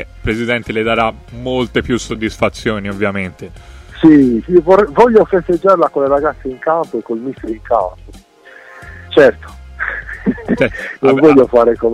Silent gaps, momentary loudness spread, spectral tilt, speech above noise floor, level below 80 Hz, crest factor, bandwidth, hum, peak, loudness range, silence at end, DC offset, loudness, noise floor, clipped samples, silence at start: none; 14 LU; -6.5 dB/octave; 27 dB; -36 dBFS; 14 dB; 12 kHz; none; 0 dBFS; 6 LU; 0 s; under 0.1%; -13 LUFS; -40 dBFS; 0.2%; 0 s